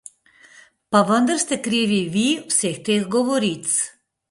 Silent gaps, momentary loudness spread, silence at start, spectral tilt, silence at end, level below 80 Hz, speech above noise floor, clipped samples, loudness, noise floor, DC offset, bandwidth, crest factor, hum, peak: none; 4 LU; 0.9 s; -3.5 dB/octave; 0.4 s; -64 dBFS; 32 dB; under 0.1%; -20 LUFS; -51 dBFS; under 0.1%; 11.5 kHz; 20 dB; none; -2 dBFS